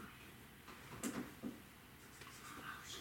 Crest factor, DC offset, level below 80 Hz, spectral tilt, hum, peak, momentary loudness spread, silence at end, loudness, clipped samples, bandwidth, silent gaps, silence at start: 24 dB; under 0.1%; -70 dBFS; -3.5 dB/octave; none; -28 dBFS; 12 LU; 0 s; -51 LUFS; under 0.1%; 17 kHz; none; 0 s